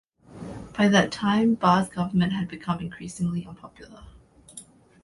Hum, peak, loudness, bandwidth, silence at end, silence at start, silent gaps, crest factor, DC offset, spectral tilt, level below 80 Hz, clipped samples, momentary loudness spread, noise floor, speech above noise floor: none; -4 dBFS; -24 LUFS; 11.5 kHz; 0.4 s; 0.3 s; none; 20 dB; under 0.1%; -6 dB/octave; -54 dBFS; under 0.1%; 24 LU; -48 dBFS; 24 dB